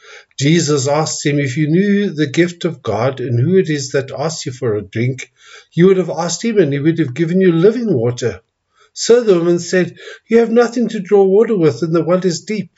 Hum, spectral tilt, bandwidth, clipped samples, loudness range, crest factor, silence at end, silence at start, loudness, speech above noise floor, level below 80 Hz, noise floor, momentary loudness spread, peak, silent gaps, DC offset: none; -6 dB/octave; 8 kHz; under 0.1%; 3 LU; 14 dB; 0.1 s; 0.1 s; -15 LUFS; 42 dB; -62 dBFS; -56 dBFS; 10 LU; 0 dBFS; none; under 0.1%